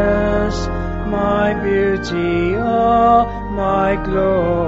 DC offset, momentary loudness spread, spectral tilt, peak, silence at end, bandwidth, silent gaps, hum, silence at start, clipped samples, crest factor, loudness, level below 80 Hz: under 0.1%; 8 LU; -5.5 dB/octave; -2 dBFS; 0 s; 8 kHz; none; none; 0 s; under 0.1%; 14 dB; -17 LUFS; -28 dBFS